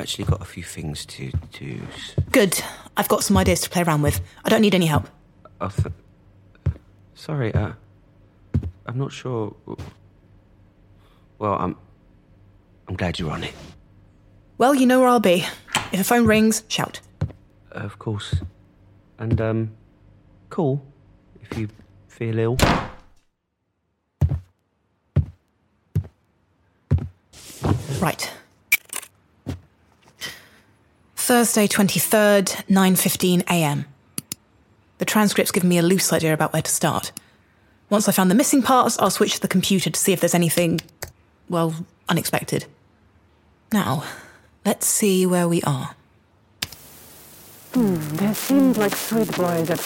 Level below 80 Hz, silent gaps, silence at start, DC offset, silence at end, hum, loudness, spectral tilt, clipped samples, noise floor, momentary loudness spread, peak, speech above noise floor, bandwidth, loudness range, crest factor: -42 dBFS; none; 0 s; under 0.1%; 0 s; none; -21 LUFS; -4.5 dB/octave; under 0.1%; -74 dBFS; 18 LU; -2 dBFS; 54 dB; 17 kHz; 11 LU; 20 dB